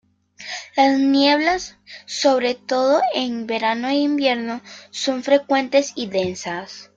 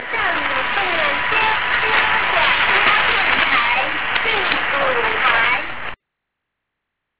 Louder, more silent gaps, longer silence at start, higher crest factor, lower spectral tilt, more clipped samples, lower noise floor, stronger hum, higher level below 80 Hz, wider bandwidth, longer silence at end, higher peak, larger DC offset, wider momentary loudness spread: second, -19 LUFS vs -16 LUFS; neither; first, 0.4 s vs 0 s; about the same, 16 dB vs 16 dB; second, -3.5 dB/octave vs -5.5 dB/octave; neither; second, -39 dBFS vs -79 dBFS; neither; second, -60 dBFS vs -46 dBFS; first, 7.8 kHz vs 4 kHz; first, 0.15 s vs 0 s; about the same, -4 dBFS vs -2 dBFS; second, under 0.1% vs 3%; first, 15 LU vs 5 LU